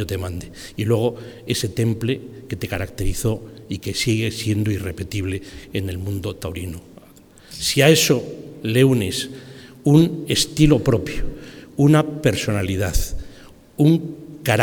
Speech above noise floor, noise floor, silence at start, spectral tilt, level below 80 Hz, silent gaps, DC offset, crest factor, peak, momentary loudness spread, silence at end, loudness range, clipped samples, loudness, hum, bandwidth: 27 dB; -47 dBFS; 0 s; -5 dB/octave; -34 dBFS; none; under 0.1%; 20 dB; 0 dBFS; 17 LU; 0 s; 6 LU; under 0.1%; -20 LUFS; none; 19.5 kHz